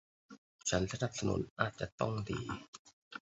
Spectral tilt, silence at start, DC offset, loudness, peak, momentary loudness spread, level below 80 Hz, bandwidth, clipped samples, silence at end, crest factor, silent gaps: -5 dB/octave; 0.3 s; under 0.1%; -38 LUFS; -14 dBFS; 14 LU; -56 dBFS; 8 kHz; under 0.1%; 0.05 s; 24 dB; 0.38-0.59 s, 1.50-1.56 s, 1.92-1.98 s, 2.68-2.73 s, 2.79-2.85 s, 2.93-3.11 s